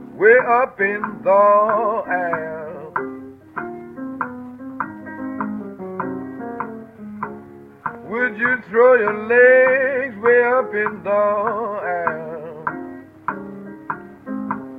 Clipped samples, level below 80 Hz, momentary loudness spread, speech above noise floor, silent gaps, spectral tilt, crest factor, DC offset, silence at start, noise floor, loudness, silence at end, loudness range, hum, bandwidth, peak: under 0.1%; -62 dBFS; 19 LU; 24 dB; none; -8.5 dB/octave; 18 dB; under 0.1%; 0 s; -40 dBFS; -18 LUFS; 0 s; 14 LU; none; 4 kHz; 0 dBFS